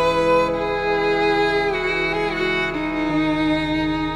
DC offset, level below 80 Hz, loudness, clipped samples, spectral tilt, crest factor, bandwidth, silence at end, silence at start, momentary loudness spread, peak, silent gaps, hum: under 0.1%; -40 dBFS; -20 LUFS; under 0.1%; -5.5 dB/octave; 14 dB; 11.5 kHz; 0 s; 0 s; 4 LU; -6 dBFS; none; none